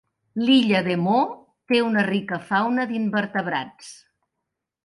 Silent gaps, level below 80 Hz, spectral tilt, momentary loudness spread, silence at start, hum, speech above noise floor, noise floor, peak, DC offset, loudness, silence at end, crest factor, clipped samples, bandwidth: none; -68 dBFS; -6 dB/octave; 17 LU; 0.35 s; none; 60 dB; -82 dBFS; -6 dBFS; under 0.1%; -22 LUFS; 0.9 s; 16 dB; under 0.1%; 11.5 kHz